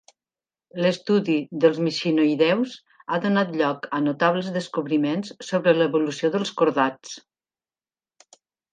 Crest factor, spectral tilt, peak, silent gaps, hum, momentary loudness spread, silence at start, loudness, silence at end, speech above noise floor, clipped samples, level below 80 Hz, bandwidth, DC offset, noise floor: 20 dB; -6 dB/octave; -4 dBFS; none; none; 9 LU; 0.75 s; -23 LUFS; 1.55 s; over 68 dB; under 0.1%; -76 dBFS; 9.4 kHz; under 0.1%; under -90 dBFS